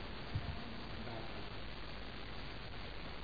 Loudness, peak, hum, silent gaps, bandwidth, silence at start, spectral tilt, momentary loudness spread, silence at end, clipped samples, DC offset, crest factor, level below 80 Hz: -47 LUFS; -28 dBFS; none; none; 5 kHz; 0 s; -4 dB/octave; 4 LU; 0 s; under 0.1%; 0.4%; 18 dB; -52 dBFS